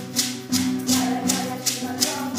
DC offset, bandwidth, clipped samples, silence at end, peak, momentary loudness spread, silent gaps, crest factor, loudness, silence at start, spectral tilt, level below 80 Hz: under 0.1%; 16 kHz; under 0.1%; 0 s; -4 dBFS; 3 LU; none; 20 dB; -23 LUFS; 0 s; -2.5 dB/octave; -70 dBFS